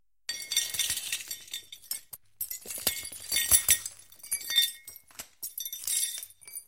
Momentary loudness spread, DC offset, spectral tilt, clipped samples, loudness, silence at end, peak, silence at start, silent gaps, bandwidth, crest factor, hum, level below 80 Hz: 19 LU; under 0.1%; 2 dB/octave; under 0.1%; -28 LUFS; 0.05 s; -6 dBFS; 0.3 s; none; 17 kHz; 26 dB; none; -58 dBFS